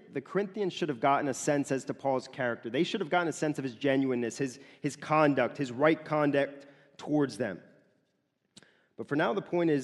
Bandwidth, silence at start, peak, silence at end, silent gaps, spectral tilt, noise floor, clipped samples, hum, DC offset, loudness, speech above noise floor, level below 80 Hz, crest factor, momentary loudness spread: 12 kHz; 0.1 s; -10 dBFS; 0 s; none; -5.5 dB/octave; -77 dBFS; under 0.1%; none; under 0.1%; -30 LUFS; 47 dB; -76 dBFS; 20 dB; 10 LU